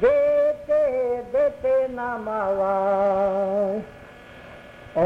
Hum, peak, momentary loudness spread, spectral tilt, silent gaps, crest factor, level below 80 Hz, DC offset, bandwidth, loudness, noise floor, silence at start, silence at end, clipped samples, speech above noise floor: none; -10 dBFS; 22 LU; -7.5 dB/octave; none; 12 dB; -52 dBFS; under 0.1%; 6.2 kHz; -23 LUFS; -44 dBFS; 0 s; 0 s; under 0.1%; 21 dB